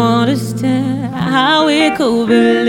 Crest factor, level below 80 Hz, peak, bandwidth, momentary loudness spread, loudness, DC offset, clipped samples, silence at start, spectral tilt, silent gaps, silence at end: 12 dB; -50 dBFS; 0 dBFS; 16.5 kHz; 6 LU; -13 LUFS; under 0.1%; under 0.1%; 0 s; -5.5 dB/octave; none; 0 s